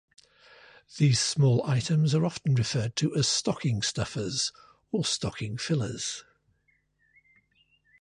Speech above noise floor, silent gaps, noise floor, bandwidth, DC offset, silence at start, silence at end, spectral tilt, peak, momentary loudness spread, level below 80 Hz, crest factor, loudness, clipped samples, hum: 44 dB; none; -71 dBFS; 11 kHz; under 0.1%; 0.9 s; 1.8 s; -4.5 dB/octave; -12 dBFS; 10 LU; -58 dBFS; 16 dB; -27 LUFS; under 0.1%; none